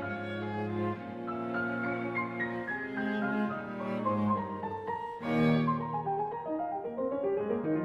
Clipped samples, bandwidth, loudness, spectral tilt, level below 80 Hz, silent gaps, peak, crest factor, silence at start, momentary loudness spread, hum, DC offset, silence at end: under 0.1%; 7.2 kHz; -33 LUFS; -8.5 dB/octave; -66 dBFS; none; -16 dBFS; 16 dB; 0 s; 7 LU; none; under 0.1%; 0 s